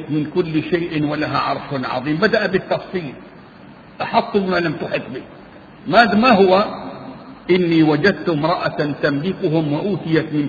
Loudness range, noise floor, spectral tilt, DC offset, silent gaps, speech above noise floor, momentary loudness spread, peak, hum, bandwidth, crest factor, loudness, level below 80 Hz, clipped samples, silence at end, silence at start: 5 LU; -41 dBFS; -8 dB/octave; under 0.1%; none; 24 dB; 17 LU; 0 dBFS; none; 7 kHz; 18 dB; -18 LUFS; -52 dBFS; under 0.1%; 0 s; 0 s